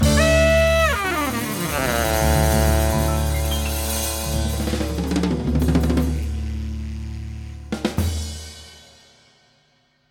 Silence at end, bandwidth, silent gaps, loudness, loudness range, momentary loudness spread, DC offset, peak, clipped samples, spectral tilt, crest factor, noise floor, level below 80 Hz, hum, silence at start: 1.3 s; 18.5 kHz; none; -21 LUFS; 10 LU; 15 LU; under 0.1%; -6 dBFS; under 0.1%; -5 dB/octave; 14 dB; -62 dBFS; -26 dBFS; none; 0 s